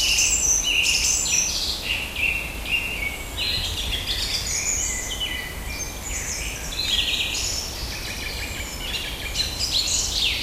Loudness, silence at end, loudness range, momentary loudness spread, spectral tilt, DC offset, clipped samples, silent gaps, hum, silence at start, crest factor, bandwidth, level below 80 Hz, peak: -22 LUFS; 0 s; 4 LU; 11 LU; -0.5 dB/octave; under 0.1%; under 0.1%; none; none; 0 s; 18 dB; 16 kHz; -36 dBFS; -8 dBFS